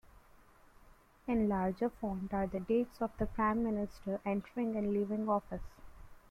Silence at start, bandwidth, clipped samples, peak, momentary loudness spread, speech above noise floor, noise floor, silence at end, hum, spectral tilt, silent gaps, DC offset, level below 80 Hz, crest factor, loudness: 0.05 s; 13.5 kHz; under 0.1%; -20 dBFS; 7 LU; 27 dB; -62 dBFS; 0.15 s; none; -9 dB/octave; none; under 0.1%; -54 dBFS; 16 dB; -35 LUFS